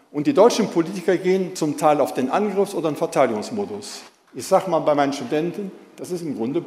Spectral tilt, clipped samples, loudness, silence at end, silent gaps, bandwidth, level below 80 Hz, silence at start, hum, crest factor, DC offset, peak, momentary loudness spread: -5.5 dB/octave; under 0.1%; -21 LUFS; 0 s; none; 16 kHz; -72 dBFS; 0.15 s; none; 18 dB; under 0.1%; -2 dBFS; 16 LU